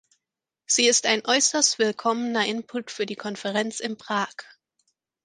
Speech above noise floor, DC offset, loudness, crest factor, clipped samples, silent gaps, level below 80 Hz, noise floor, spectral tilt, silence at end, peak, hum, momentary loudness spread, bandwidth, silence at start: 62 dB; under 0.1%; -23 LUFS; 22 dB; under 0.1%; none; -76 dBFS; -87 dBFS; -1 dB/octave; 0.8 s; -4 dBFS; none; 13 LU; 11 kHz; 0.7 s